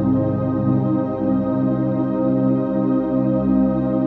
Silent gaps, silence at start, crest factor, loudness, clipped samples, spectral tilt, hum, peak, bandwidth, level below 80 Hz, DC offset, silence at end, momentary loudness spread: none; 0 s; 12 dB; -19 LUFS; under 0.1%; -12.5 dB/octave; none; -6 dBFS; 4 kHz; -42 dBFS; under 0.1%; 0 s; 2 LU